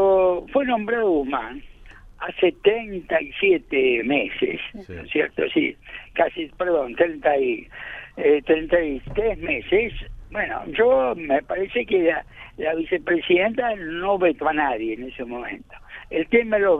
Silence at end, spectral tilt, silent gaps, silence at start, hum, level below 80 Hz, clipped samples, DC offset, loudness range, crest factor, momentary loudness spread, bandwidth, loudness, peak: 0 s; -7.5 dB/octave; none; 0 s; none; -46 dBFS; under 0.1%; under 0.1%; 2 LU; 18 dB; 13 LU; 3.9 kHz; -22 LUFS; -4 dBFS